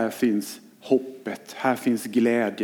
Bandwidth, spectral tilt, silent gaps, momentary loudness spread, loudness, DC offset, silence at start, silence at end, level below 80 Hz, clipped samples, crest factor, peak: 18.5 kHz; -5 dB/octave; none; 13 LU; -25 LUFS; under 0.1%; 0 s; 0 s; -78 dBFS; under 0.1%; 18 dB; -6 dBFS